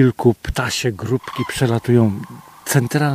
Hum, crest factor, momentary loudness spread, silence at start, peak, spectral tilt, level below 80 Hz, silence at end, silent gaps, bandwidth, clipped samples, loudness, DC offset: none; 18 dB; 10 LU; 0 s; 0 dBFS; -5.5 dB/octave; -38 dBFS; 0 s; none; 15.5 kHz; under 0.1%; -19 LUFS; under 0.1%